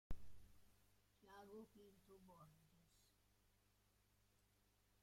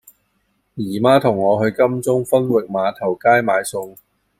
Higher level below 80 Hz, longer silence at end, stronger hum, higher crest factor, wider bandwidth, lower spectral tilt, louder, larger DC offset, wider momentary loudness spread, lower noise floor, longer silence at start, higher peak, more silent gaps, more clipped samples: second, -68 dBFS vs -60 dBFS; first, 1.95 s vs 0.5 s; first, 50 Hz at -80 dBFS vs none; first, 22 dB vs 16 dB; about the same, 16 kHz vs 16 kHz; about the same, -6 dB/octave vs -6 dB/octave; second, -65 LUFS vs -17 LUFS; neither; second, 8 LU vs 13 LU; first, -80 dBFS vs -66 dBFS; second, 0.1 s vs 0.75 s; second, -36 dBFS vs -2 dBFS; neither; neither